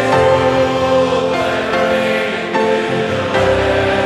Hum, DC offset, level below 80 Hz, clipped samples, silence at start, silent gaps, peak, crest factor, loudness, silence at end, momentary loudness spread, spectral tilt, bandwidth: none; under 0.1%; -38 dBFS; under 0.1%; 0 s; none; -2 dBFS; 12 dB; -14 LUFS; 0 s; 4 LU; -5.5 dB/octave; 13 kHz